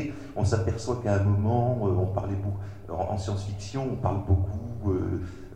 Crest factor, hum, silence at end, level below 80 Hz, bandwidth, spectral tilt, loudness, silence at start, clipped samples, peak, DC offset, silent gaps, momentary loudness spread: 16 dB; none; 0 s; -44 dBFS; 9.4 kHz; -8 dB/octave; -28 LUFS; 0 s; under 0.1%; -10 dBFS; 0.4%; none; 9 LU